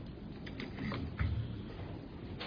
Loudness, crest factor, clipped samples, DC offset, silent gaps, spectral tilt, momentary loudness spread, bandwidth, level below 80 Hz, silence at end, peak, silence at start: -42 LUFS; 18 dB; under 0.1%; under 0.1%; none; -6 dB/octave; 9 LU; 5.2 kHz; -48 dBFS; 0 s; -22 dBFS; 0 s